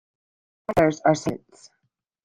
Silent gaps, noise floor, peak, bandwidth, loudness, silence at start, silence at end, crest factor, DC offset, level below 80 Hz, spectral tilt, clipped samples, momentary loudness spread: none; -75 dBFS; -4 dBFS; 16 kHz; -22 LUFS; 0.7 s; 0.85 s; 22 dB; under 0.1%; -52 dBFS; -6 dB/octave; under 0.1%; 18 LU